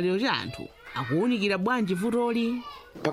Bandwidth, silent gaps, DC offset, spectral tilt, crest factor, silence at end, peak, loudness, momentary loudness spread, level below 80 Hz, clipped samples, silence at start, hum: 15 kHz; none; under 0.1%; -6 dB/octave; 16 dB; 0 s; -12 dBFS; -27 LUFS; 12 LU; -60 dBFS; under 0.1%; 0 s; none